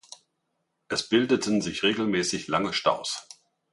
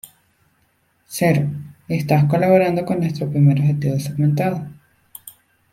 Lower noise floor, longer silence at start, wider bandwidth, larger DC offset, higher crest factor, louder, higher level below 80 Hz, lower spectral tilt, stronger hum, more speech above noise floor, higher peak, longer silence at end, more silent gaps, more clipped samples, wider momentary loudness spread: first, -77 dBFS vs -63 dBFS; second, 0.9 s vs 1.1 s; second, 11.5 kHz vs 15.5 kHz; neither; about the same, 20 dB vs 18 dB; second, -26 LUFS vs -18 LUFS; second, -62 dBFS vs -54 dBFS; second, -3.5 dB/octave vs -7.5 dB/octave; neither; first, 52 dB vs 46 dB; second, -8 dBFS vs -2 dBFS; about the same, 0.5 s vs 0.4 s; neither; neither; second, 7 LU vs 18 LU